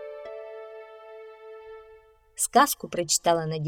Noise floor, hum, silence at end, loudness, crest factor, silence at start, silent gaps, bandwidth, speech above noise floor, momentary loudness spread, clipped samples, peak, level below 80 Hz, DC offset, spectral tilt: -54 dBFS; none; 0 s; -23 LUFS; 22 dB; 0 s; none; 18 kHz; 30 dB; 24 LU; under 0.1%; -6 dBFS; -64 dBFS; under 0.1%; -3 dB/octave